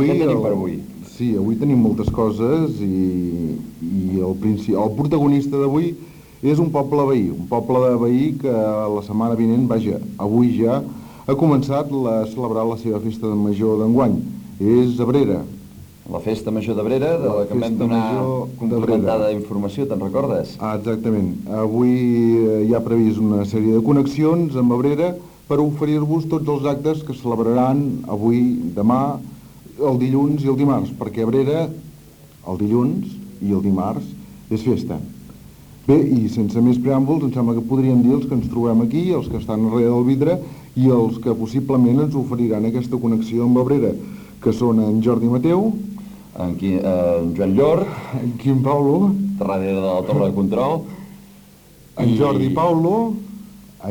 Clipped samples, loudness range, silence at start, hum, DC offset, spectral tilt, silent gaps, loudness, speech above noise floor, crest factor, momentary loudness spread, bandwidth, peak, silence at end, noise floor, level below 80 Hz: under 0.1%; 3 LU; 0 s; none; under 0.1%; -9 dB/octave; none; -19 LUFS; 28 dB; 16 dB; 9 LU; 20 kHz; -2 dBFS; 0 s; -46 dBFS; -46 dBFS